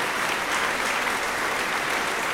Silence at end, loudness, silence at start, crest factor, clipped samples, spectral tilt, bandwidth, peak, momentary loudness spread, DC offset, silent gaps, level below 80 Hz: 0 s; -24 LUFS; 0 s; 14 dB; under 0.1%; -1.5 dB/octave; 18 kHz; -10 dBFS; 1 LU; under 0.1%; none; -54 dBFS